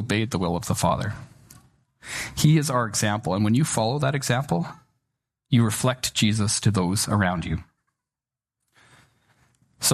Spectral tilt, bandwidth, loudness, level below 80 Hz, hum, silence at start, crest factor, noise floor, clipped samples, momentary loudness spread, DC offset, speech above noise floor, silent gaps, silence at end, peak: -4.5 dB/octave; 13.5 kHz; -23 LUFS; -50 dBFS; none; 0 s; 18 dB; under -90 dBFS; under 0.1%; 10 LU; under 0.1%; over 67 dB; none; 0 s; -6 dBFS